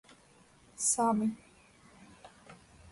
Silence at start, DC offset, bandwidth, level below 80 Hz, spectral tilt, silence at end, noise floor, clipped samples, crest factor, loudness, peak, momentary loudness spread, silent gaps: 0.8 s; under 0.1%; 11.5 kHz; -70 dBFS; -4 dB/octave; 0.35 s; -62 dBFS; under 0.1%; 20 dB; -30 LUFS; -16 dBFS; 27 LU; none